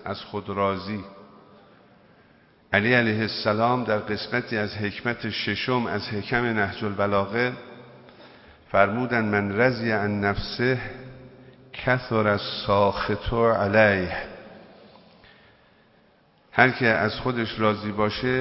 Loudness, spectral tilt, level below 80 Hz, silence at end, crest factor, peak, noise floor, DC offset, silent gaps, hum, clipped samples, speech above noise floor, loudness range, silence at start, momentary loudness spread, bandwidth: -24 LUFS; -9.5 dB/octave; -48 dBFS; 0 s; 24 dB; 0 dBFS; -59 dBFS; under 0.1%; none; none; under 0.1%; 36 dB; 3 LU; 0 s; 11 LU; 5.8 kHz